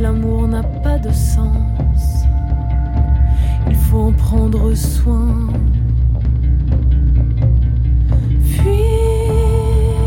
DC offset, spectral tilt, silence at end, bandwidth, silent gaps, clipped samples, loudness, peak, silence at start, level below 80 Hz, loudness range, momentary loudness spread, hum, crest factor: under 0.1%; -8 dB/octave; 0 s; 16.5 kHz; none; under 0.1%; -15 LUFS; -2 dBFS; 0 s; -14 dBFS; 2 LU; 3 LU; none; 10 dB